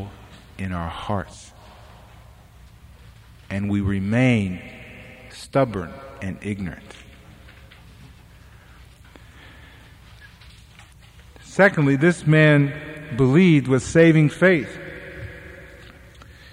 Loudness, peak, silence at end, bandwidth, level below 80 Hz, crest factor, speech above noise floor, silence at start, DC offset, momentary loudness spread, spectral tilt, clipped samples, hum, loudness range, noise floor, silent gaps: -19 LUFS; -4 dBFS; 0.85 s; 11.5 kHz; -48 dBFS; 20 dB; 28 dB; 0 s; under 0.1%; 25 LU; -7 dB/octave; under 0.1%; none; 17 LU; -47 dBFS; none